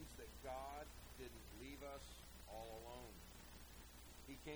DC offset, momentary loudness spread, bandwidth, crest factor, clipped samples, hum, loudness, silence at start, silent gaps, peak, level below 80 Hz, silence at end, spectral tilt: under 0.1%; 8 LU; over 20 kHz; 16 dB; under 0.1%; none; -56 LUFS; 0 s; none; -38 dBFS; -62 dBFS; 0 s; -4 dB/octave